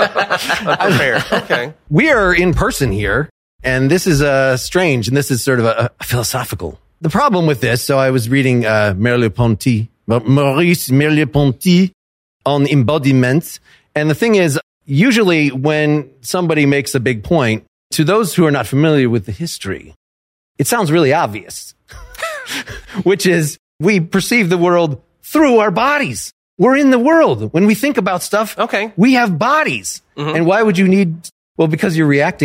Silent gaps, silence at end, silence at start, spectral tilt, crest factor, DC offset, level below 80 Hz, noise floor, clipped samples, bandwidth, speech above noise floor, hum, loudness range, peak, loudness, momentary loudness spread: 3.31-3.59 s, 11.94-12.40 s, 14.63-14.81 s, 17.68-17.90 s, 19.96-20.55 s, 23.59-23.79 s, 26.33-26.57 s, 31.32-31.55 s; 0 s; 0 s; -5.5 dB/octave; 14 dB; under 0.1%; -38 dBFS; under -90 dBFS; under 0.1%; 16 kHz; over 77 dB; none; 3 LU; 0 dBFS; -14 LUFS; 11 LU